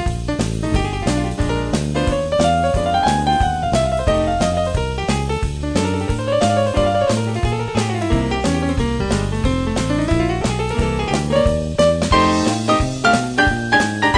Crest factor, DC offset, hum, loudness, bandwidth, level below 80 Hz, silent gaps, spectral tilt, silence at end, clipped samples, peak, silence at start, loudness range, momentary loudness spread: 18 dB; under 0.1%; none; -18 LUFS; 10 kHz; -26 dBFS; none; -5.5 dB/octave; 0 s; under 0.1%; 0 dBFS; 0 s; 2 LU; 5 LU